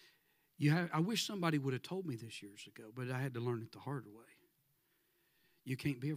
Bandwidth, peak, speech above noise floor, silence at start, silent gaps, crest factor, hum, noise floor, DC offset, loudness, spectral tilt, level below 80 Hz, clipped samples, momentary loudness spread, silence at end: 16 kHz; -20 dBFS; 39 dB; 0.6 s; none; 22 dB; none; -78 dBFS; under 0.1%; -39 LUFS; -5.5 dB/octave; -82 dBFS; under 0.1%; 17 LU; 0 s